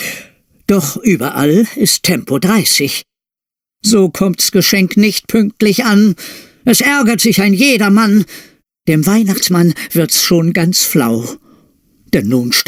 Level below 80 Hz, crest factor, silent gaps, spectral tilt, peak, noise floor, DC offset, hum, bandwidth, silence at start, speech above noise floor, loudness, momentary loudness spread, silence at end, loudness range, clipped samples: -50 dBFS; 12 dB; none; -4 dB/octave; 0 dBFS; -86 dBFS; under 0.1%; none; 16.5 kHz; 0 s; 75 dB; -11 LUFS; 9 LU; 0.05 s; 2 LU; under 0.1%